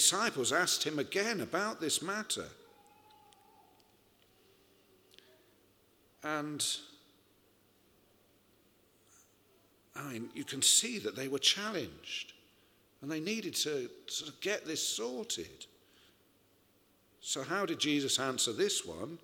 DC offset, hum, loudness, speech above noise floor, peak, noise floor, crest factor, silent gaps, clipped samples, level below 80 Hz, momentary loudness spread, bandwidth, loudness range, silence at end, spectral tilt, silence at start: under 0.1%; none; -33 LUFS; 34 dB; -12 dBFS; -69 dBFS; 26 dB; none; under 0.1%; -76 dBFS; 15 LU; over 20 kHz; 11 LU; 0.05 s; -1.5 dB/octave; 0 s